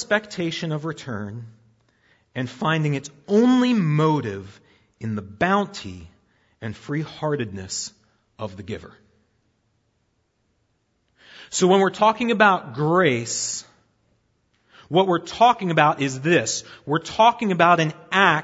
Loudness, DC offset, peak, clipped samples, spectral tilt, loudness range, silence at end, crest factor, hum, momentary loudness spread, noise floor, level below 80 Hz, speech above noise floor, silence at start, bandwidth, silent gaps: -21 LUFS; under 0.1%; 0 dBFS; under 0.1%; -4.5 dB/octave; 12 LU; 0 s; 22 dB; none; 18 LU; -69 dBFS; -62 dBFS; 48 dB; 0 s; 8 kHz; none